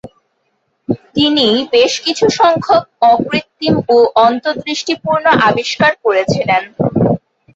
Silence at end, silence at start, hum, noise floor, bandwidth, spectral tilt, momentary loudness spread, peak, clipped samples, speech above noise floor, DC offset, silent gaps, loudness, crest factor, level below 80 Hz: 0.4 s; 0.05 s; none; -64 dBFS; 8 kHz; -4.5 dB/octave; 8 LU; 0 dBFS; under 0.1%; 52 dB; under 0.1%; none; -13 LUFS; 12 dB; -48 dBFS